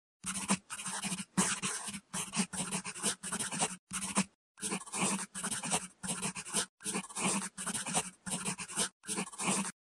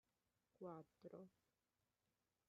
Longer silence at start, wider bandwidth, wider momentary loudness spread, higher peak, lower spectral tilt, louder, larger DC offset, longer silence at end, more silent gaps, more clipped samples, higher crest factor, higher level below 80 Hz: second, 0.25 s vs 0.6 s; first, 13 kHz vs 5.8 kHz; about the same, 5 LU vs 6 LU; first, -16 dBFS vs -44 dBFS; second, -2 dB/octave vs -8.5 dB/octave; first, -35 LUFS vs -61 LUFS; neither; second, 0.25 s vs 1.2 s; first, 3.79-3.87 s, 4.35-4.55 s, 6.69-6.78 s, 8.92-9.00 s vs none; neither; about the same, 22 dB vs 20 dB; first, -70 dBFS vs under -90 dBFS